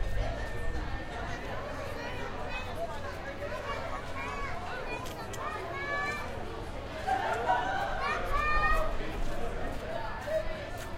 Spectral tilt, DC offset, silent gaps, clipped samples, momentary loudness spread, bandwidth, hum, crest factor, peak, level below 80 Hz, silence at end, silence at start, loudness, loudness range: -5 dB/octave; under 0.1%; none; under 0.1%; 9 LU; 15.5 kHz; none; 18 dB; -14 dBFS; -40 dBFS; 0 s; 0 s; -35 LUFS; 6 LU